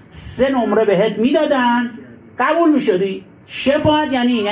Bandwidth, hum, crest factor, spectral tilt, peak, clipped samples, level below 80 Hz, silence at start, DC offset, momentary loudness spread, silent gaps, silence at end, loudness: 4 kHz; none; 12 dB; -10 dB/octave; -4 dBFS; under 0.1%; -46 dBFS; 0.15 s; under 0.1%; 12 LU; none; 0 s; -16 LUFS